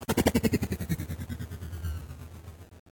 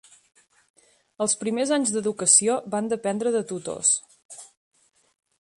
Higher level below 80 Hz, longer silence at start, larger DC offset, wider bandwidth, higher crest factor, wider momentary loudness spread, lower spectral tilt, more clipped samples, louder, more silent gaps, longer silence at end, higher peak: first, -42 dBFS vs -72 dBFS; second, 0 s vs 1.2 s; neither; first, 18 kHz vs 11.5 kHz; about the same, 22 dB vs 24 dB; about the same, 21 LU vs 22 LU; first, -5.5 dB/octave vs -2.5 dB/octave; neither; second, -31 LUFS vs -22 LUFS; second, none vs 4.25-4.29 s; second, 0.2 s vs 1.1 s; second, -10 dBFS vs -2 dBFS